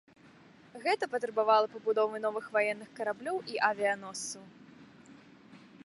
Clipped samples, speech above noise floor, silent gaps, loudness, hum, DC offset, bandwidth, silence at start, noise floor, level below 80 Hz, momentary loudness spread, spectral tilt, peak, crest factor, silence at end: under 0.1%; 26 dB; none; -31 LUFS; none; under 0.1%; 11.5 kHz; 0.75 s; -58 dBFS; -82 dBFS; 12 LU; -2.5 dB/octave; -12 dBFS; 22 dB; 0.1 s